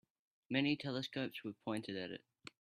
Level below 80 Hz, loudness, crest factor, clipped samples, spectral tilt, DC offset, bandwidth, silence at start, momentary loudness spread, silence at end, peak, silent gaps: -80 dBFS; -41 LUFS; 22 dB; under 0.1%; -6 dB/octave; under 0.1%; 15 kHz; 0.5 s; 13 LU; 0.45 s; -20 dBFS; none